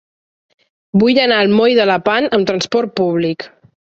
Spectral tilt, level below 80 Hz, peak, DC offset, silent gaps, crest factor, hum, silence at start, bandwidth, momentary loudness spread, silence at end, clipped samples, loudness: -5.5 dB/octave; -56 dBFS; -2 dBFS; under 0.1%; none; 14 dB; none; 0.95 s; 8 kHz; 8 LU; 0.5 s; under 0.1%; -14 LUFS